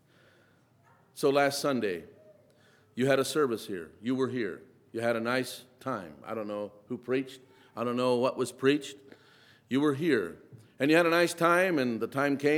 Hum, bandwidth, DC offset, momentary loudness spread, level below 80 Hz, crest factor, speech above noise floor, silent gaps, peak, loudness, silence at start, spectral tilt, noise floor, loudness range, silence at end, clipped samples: none; 17.5 kHz; under 0.1%; 15 LU; -78 dBFS; 22 dB; 35 dB; none; -8 dBFS; -29 LUFS; 1.15 s; -5 dB/octave; -64 dBFS; 6 LU; 0 s; under 0.1%